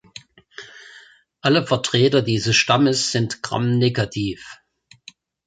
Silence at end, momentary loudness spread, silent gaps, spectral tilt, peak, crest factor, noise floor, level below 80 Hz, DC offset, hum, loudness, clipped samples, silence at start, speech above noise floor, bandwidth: 0.9 s; 22 LU; none; -4.5 dB/octave; -2 dBFS; 18 dB; -49 dBFS; -54 dBFS; under 0.1%; none; -19 LUFS; under 0.1%; 0.15 s; 30 dB; 9.4 kHz